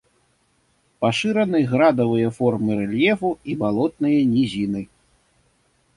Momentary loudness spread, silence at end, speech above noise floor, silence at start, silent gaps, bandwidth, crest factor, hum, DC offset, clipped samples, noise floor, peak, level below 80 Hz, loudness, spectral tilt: 8 LU; 1.1 s; 45 dB; 1 s; none; 11.5 kHz; 16 dB; none; under 0.1%; under 0.1%; -64 dBFS; -4 dBFS; -56 dBFS; -20 LUFS; -7 dB/octave